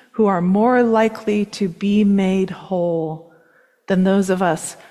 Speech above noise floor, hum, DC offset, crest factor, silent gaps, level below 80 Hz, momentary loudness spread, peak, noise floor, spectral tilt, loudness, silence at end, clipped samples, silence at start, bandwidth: 38 dB; none; under 0.1%; 14 dB; none; -56 dBFS; 8 LU; -4 dBFS; -56 dBFS; -6.5 dB/octave; -18 LUFS; 0.15 s; under 0.1%; 0.15 s; 13 kHz